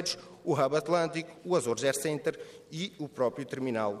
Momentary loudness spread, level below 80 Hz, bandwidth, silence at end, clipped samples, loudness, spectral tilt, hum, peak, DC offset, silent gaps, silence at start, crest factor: 10 LU; -74 dBFS; 15.5 kHz; 0 s; under 0.1%; -31 LUFS; -4.5 dB/octave; none; -14 dBFS; under 0.1%; none; 0 s; 18 dB